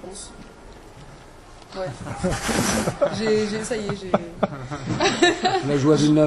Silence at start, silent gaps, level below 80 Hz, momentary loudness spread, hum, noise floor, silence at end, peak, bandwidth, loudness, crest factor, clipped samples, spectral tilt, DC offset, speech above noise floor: 0 s; none; -44 dBFS; 15 LU; none; -44 dBFS; 0 s; -4 dBFS; 12.5 kHz; -22 LUFS; 20 dB; under 0.1%; -4.5 dB/octave; under 0.1%; 22 dB